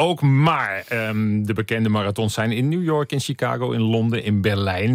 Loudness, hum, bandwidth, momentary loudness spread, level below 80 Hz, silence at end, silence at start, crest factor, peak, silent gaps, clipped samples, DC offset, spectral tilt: -21 LUFS; none; 16 kHz; 6 LU; -60 dBFS; 0 s; 0 s; 14 dB; -6 dBFS; none; under 0.1%; under 0.1%; -6.5 dB/octave